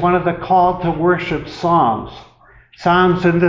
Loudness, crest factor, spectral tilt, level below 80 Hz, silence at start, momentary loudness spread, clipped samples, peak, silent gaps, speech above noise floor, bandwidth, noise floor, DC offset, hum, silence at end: -16 LUFS; 12 dB; -8 dB/octave; -42 dBFS; 0 s; 9 LU; under 0.1%; -4 dBFS; none; 32 dB; 7.6 kHz; -47 dBFS; under 0.1%; none; 0 s